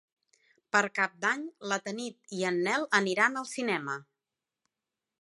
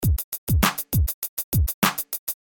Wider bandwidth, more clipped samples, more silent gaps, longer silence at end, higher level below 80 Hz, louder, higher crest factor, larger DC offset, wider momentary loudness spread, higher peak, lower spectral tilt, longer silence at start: second, 11.5 kHz vs 17.5 kHz; neither; second, none vs 0.24-0.32 s, 0.38-0.47 s, 1.14-1.22 s, 1.29-1.37 s, 1.44-1.52 s, 1.74-1.82 s, 2.19-2.27 s; first, 1.2 s vs 0.1 s; second, -84 dBFS vs -30 dBFS; second, -30 LUFS vs -24 LUFS; about the same, 22 dB vs 18 dB; neither; first, 11 LU vs 7 LU; second, -10 dBFS vs -4 dBFS; about the same, -3.5 dB/octave vs -4 dB/octave; first, 0.75 s vs 0 s